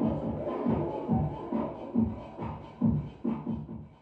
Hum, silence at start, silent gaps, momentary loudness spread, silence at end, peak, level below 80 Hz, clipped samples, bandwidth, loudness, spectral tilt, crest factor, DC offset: none; 0 s; none; 10 LU; 0.05 s; -16 dBFS; -48 dBFS; under 0.1%; 4.5 kHz; -32 LUFS; -11 dB/octave; 16 dB; under 0.1%